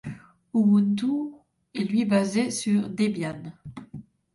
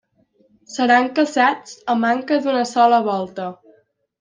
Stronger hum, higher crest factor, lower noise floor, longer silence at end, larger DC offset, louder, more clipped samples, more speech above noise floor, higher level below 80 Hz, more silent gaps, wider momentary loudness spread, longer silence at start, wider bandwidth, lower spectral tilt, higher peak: neither; about the same, 14 dB vs 16 dB; second, -45 dBFS vs -60 dBFS; second, 0.35 s vs 0.65 s; neither; second, -25 LUFS vs -18 LUFS; neither; second, 21 dB vs 42 dB; first, -64 dBFS vs -70 dBFS; neither; first, 21 LU vs 13 LU; second, 0.05 s vs 0.7 s; first, 11.5 kHz vs 9.6 kHz; first, -6 dB/octave vs -4 dB/octave; second, -12 dBFS vs -2 dBFS